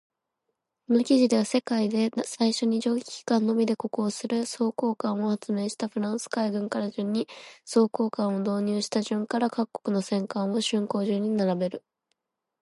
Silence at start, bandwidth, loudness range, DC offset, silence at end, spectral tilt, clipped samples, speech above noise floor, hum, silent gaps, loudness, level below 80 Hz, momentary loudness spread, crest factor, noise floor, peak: 0.9 s; 11.5 kHz; 3 LU; under 0.1%; 0.85 s; -5.5 dB/octave; under 0.1%; 55 dB; none; none; -27 LUFS; -76 dBFS; 6 LU; 16 dB; -81 dBFS; -10 dBFS